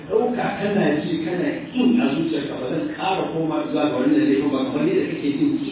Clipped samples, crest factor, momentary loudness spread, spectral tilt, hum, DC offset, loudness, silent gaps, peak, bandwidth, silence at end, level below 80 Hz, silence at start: under 0.1%; 14 dB; 6 LU; -11 dB/octave; none; under 0.1%; -21 LUFS; none; -8 dBFS; 4 kHz; 0 s; -56 dBFS; 0 s